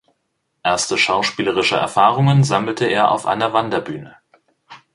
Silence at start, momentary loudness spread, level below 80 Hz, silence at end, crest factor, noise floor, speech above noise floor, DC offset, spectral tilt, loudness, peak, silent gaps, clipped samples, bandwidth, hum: 0.65 s; 9 LU; -56 dBFS; 0.2 s; 18 dB; -71 dBFS; 54 dB; under 0.1%; -4.5 dB/octave; -17 LUFS; 0 dBFS; none; under 0.1%; 11.5 kHz; none